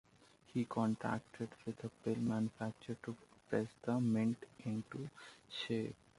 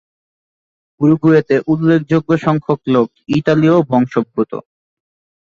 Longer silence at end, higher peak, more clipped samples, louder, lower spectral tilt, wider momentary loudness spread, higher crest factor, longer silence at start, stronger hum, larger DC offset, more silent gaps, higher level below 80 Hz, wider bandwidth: second, 0.25 s vs 0.8 s; second, -22 dBFS vs -2 dBFS; neither; second, -41 LUFS vs -14 LUFS; second, -7 dB/octave vs -8.5 dB/octave; first, 12 LU vs 7 LU; about the same, 18 dB vs 14 dB; second, 0.55 s vs 1 s; neither; neither; neither; second, -74 dBFS vs -54 dBFS; first, 11.5 kHz vs 7.2 kHz